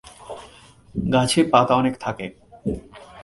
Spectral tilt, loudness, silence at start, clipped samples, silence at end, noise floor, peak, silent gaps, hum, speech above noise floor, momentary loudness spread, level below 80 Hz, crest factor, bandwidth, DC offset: -5 dB/octave; -21 LUFS; 0.05 s; under 0.1%; 0 s; -48 dBFS; 0 dBFS; none; none; 29 dB; 22 LU; -46 dBFS; 22 dB; 11.5 kHz; under 0.1%